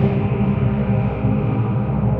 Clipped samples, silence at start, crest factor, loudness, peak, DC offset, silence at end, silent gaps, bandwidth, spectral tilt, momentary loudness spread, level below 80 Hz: under 0.1%; 0 s; 14 dB; -19 LUFS; -4 dBFS; under 0.1%; 0 s; none; 3.9 kHz; -12 dB/octave; 1 LU; -32 dBFS